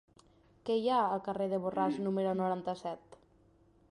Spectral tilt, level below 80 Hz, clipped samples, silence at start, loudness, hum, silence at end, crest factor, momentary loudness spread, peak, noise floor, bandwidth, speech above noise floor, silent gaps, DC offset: -7.5 dB/octave; -72 dBFS; under 0.1%; 0.65 s; -34 LUFS; none; 0.75 s; 16 dB; 11 LU; -18 dBFS; -66 dBFS; 11 kHz; 33 dB; none; under 0.1%